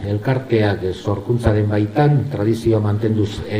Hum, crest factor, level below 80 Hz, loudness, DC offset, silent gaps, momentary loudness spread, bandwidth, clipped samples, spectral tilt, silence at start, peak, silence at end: none; 16 dB; -40 dBFS; -18 LUFS; under 0.1%; none; 5 LU; 11 kHz; under 0.1%; -8 dB/octave; 0 s; -2 dBFS; 0 s